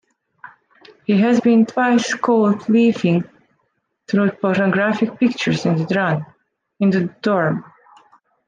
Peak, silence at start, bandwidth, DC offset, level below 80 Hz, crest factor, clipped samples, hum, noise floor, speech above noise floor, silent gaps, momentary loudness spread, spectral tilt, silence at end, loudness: -4 dBFS; 0.45 s; 9 kHz; under 0.1%; -64 dBFS; 14 dB; under 0.1%; none; -69 dBFS; 53 dB; none; 7 LU; -6.5 dB/octave; 0.85 s; -18 LUFS